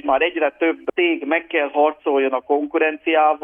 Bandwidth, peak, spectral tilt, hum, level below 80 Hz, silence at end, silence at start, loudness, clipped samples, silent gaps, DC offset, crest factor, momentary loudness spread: 3.7 kHz; -4 dBFS; -6.5 dB/octave; none; -60 dBFS; 0.05 s; 0.05 s; -19 LUFS; under 0.1%; none; under 0.1%; 14 dB; 3 LU